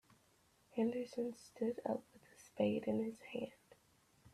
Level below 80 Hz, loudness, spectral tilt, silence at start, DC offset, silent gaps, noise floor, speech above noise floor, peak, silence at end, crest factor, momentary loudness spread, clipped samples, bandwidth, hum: -80 dBFS; -42 LUFS; -6.5 dB/octave; 0.75 s; under 0.1%; none; -73 dBFS; 33 dB; -24 dBFS; 0.05 s; 18 dB; 10 LU; under 0.1%; 13.5 kHz; none